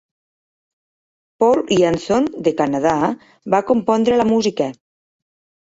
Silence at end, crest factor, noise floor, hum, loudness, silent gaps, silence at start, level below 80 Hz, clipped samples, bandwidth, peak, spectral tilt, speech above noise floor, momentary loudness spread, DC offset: 0.9 s; 18 dB; under -90 dBFS; none; -17 LUFS; none; 1.4 s; -54 dBFS; under 0.1%; 8 kHz; -2 dBFS; -5.5 dB/octave; over 73 dB; 6 LU; under 0.1%